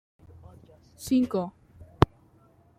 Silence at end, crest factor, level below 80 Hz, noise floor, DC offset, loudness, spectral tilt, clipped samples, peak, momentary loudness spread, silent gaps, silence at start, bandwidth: 0.75 s; 28 dB; -48 dBFS; -60 dBFS; under 0.1%; -27 LUFS; -7 dB/octave; under 0.1%; -2 dBFS; 13 LU; none; 1 s; 15.5 kHz